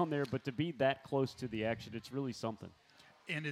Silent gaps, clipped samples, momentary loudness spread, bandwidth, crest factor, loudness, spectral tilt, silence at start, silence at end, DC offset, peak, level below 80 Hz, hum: none; under 0.1%; 10 LU; 14 kHz; 18 dB; -38 LUFS; -6.5 dB/octave; 0 s; 0 s; under 0.1%; -20 dBFS; -72 dBFS; none